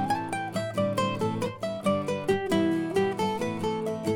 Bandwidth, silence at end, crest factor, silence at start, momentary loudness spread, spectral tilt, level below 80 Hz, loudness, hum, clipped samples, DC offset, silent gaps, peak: 17 kHz; 0 s; 16 dB; 0 s; 5 LU; -6 dB/octave; -60 dBFS; -28 LUFS; none; under 0.1%; under 0.1%; none; -12 dBFS